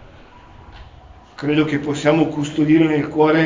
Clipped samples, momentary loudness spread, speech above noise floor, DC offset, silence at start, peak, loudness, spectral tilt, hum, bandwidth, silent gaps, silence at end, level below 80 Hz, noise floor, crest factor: under 0.1%; 5 LU; 27 dB; under 0.1%; 0.7 s; -2 dBFS; -17 LUFS; -6.5 dB/octave; none; 7.6 kHz; none; 0 s; -48 dBFS; -43 dBFS; 16 dB